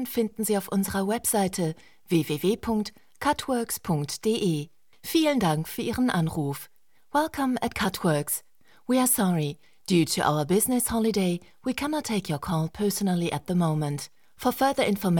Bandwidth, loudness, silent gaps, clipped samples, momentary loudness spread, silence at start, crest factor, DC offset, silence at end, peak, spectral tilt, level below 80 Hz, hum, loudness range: 18 kHz; -26 LUFS; none; under 0.1%; 9 LU; 0 s; 18 dB; 0.2%; 0 s; -8 dBFS; -5 dB/octave; -54 dBFS; none; 3 LU